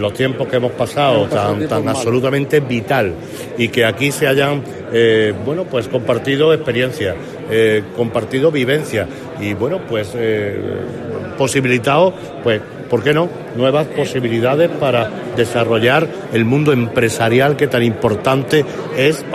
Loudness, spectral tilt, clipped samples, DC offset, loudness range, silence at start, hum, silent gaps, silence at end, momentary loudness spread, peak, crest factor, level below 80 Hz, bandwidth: -16 LUFS; -5.5 dB/octave; under 0.1%; under 0.1%; 3 LU; 0 s; none; none; 0 s; 8 LU; -2 dBFS; 14 dB; -50 dBFS; 14.5 kHz